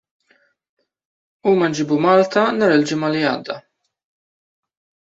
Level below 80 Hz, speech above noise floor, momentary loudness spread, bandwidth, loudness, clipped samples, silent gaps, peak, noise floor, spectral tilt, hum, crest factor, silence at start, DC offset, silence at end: -64 dBFS; 44 dB; 11 LU; 8 kHz; -17 LUFS; under 0.1%; none; -2 dBFS; -61 dBFS; -5.5 dB/octave; none; 18 dB; 1.45 s; under 0.1%; 1.45 s